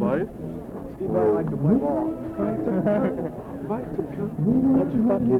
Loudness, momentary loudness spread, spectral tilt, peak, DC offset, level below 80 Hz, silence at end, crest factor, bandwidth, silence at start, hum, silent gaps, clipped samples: -24 LUFS; 12 LU; -10.5 dB/octave; -10 dBFS; under 0.1%; -48 dBFS; 0 s; 14 dB; 4.1 kHz; 0 s; none; none; under 0.1%